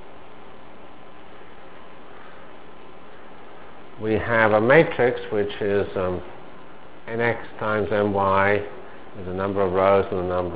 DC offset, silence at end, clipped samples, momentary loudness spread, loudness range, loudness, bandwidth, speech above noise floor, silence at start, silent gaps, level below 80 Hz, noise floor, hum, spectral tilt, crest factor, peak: 2%; 0 s; under 0.1%; 27 LU; 4 LU; -22 LUFS; 4 kHz; 24 dB; 0 s; none; -48 dBFS; -45 dBFS; none; -10 dB/octave; 24 dB; -2 dBFS